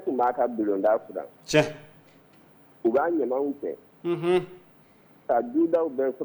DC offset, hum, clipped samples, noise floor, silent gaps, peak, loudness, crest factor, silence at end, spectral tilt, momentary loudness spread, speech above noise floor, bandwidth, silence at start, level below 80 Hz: under 0.1%; none; under 0.1%; -56 dBFS; none; -6 dBFS; -26 LUFS; 22 dB; 0 s; -6 dB/octave; 13 LU; 31 dB; over 20 kHz; 0 s; -66 dBFS